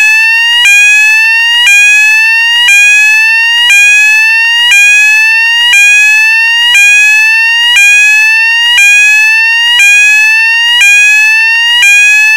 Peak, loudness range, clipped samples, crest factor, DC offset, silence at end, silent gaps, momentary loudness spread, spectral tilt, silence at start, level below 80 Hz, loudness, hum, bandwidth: 0 dBFS; 0 LU; under 0.1%; 4 dB; 0.5%; 0 s; none; 3 LU; 7 dB/octave; 0 s; -56 dBFS; -2 LUFS; 50 Hz at -65 dBFS; 18 kHz